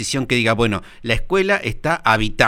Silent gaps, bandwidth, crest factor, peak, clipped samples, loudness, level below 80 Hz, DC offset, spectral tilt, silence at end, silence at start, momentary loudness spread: none; 16 kHz; 18 dB; 0 dBFS; under 0.1%; -18 LUFS; -32 dBFS; under 0.1%; -4.5 dB/octave; 0 s; 0 s; 6 LU